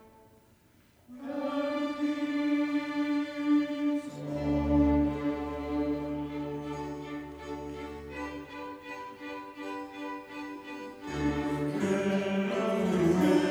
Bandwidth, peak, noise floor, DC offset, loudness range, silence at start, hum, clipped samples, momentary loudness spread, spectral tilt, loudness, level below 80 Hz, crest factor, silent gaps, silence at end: 13.5 kHz; -14 dBFS; -62 dBFS; under 0.1%; 11 LU; 0 s; none; under 0.1%; 15 LU; -7 dB/octave; -32 LUFS; -48 dBFS; 16 dB; none; 0 s